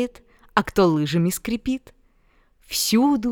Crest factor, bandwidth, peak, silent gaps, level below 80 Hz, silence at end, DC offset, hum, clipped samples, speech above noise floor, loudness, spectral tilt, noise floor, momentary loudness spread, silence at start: 20 dB; over 20 kHz; -2 dBFS; none; -48 dBFS; 0 s; under 0.1%; none; under 0.1%; 38 dB; -22 LUFS; -5 dB/octave; -59 dBFS; 10 LU; 0 s